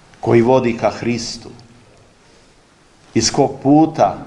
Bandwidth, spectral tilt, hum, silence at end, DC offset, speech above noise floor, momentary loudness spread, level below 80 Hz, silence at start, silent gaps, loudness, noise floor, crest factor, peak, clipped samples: 11 kHz; -5 dB/octave; none; 0 s; under 0.1%; 35 dB; 10 LU; -48 dBFS; 0.25 s; none; -15 LUFS; -50 dBFS; 16 dB; 0 dBFS; under 0.1%